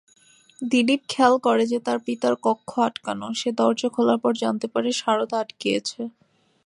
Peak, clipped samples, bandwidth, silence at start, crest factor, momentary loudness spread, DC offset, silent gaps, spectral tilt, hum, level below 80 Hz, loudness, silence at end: -4 dBFS; under 0.1%; 11 kHz; 0.6 s; 20 dB; 8 LU; under 0.1%; none; -4 dB/octave; none; -70 dBFS; -23 LUFS; 0.55 s